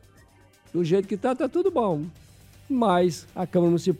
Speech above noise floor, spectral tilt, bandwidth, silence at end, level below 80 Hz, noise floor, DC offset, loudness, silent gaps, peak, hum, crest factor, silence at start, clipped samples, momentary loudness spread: 32 dB; -7 dB/octave; 14 kHz; 0 s; -58 dBFS; -55 dBFS; under 0.1%; -25 LUFS; none; -8 dBFS; none; 16 dB; 0.75 s; under 0.1%; 10 LU